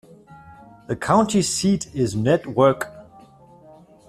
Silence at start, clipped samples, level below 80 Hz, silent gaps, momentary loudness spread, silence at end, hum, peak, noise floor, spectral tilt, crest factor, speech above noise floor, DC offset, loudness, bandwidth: 0.3 s; under 0.1%; -54 dBFS; none; 11 LU; 1.05 s; none; -4 dBFS; -48 dBFS; -5 dB/octave; 20 dB; 29 dB; under 0.1%; -20 LUFS; 14.5 kHz